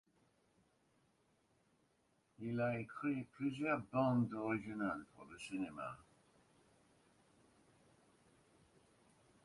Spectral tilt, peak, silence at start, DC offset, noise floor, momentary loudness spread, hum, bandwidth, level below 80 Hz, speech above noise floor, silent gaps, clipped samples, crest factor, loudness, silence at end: -7.5 dB/octave; -24 dBFS; 2.4 s; under 0.1%; -78 dBFS; 14 LU; none; 11.5 kHz; -78 dBFS; 38 dB; none; under 0.1%; 22 dB; -41 LUFS; 3.45 s